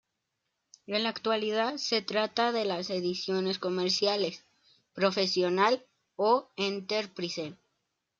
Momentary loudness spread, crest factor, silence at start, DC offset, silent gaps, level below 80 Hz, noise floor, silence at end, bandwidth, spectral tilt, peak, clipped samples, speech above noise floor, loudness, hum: 8 LU; 18 dB; 0.9 s; under 0.1%; none; -78 dBFS; -83 dBFS; 0.65 s; 7.8 kHz; -4 dB/octave; -12 dBFS; under 0.1%; 53 dB; -29 LUFS; none